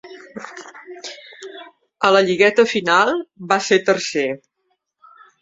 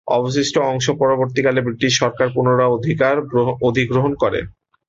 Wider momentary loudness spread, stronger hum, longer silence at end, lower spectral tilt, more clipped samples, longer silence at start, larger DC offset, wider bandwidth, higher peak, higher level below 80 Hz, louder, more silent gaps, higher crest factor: first, 22 LU vs 3 LU; neither; first, 1.05 s vs 0.4 s; second, -3.5 dB/octave vs -5 dB/octave; neither; about the same, 0.05 s vs 0.05 s; neither; about the same, 7.8 kHz vs 7.8 kHz; about the same, -2 dBFS vs -2 dBFS; second, -66 dBFS vs -48 dBFS; about the same, -17 LUFS vs -17 LUFS; neither; about the same, 18 dB vs 14 dB